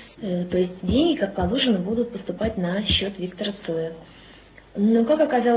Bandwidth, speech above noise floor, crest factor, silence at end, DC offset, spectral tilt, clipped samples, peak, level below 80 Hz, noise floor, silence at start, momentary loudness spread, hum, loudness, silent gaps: 4 kHz; 26 dB; 14 dB; 0 s; under 0.1%; -10.5 dB/octave; under 0.1%; -8 dBFS; -42 dBFS; -48 dBFS; 0 s; 10 LU; none; -23 LUFS; none